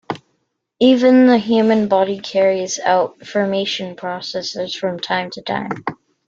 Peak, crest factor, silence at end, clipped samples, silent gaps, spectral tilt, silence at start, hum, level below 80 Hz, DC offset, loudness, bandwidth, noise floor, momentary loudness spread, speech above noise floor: -2 dBFS; 16 dB; 0.35 s; under 0.1%; none; -4.5 dB/octave; 0.1 s; none; -62 dBFS; under 0.1%; -17 LUFS; 7.6 kHz; -69 dBFS; 14 LU; 53 dB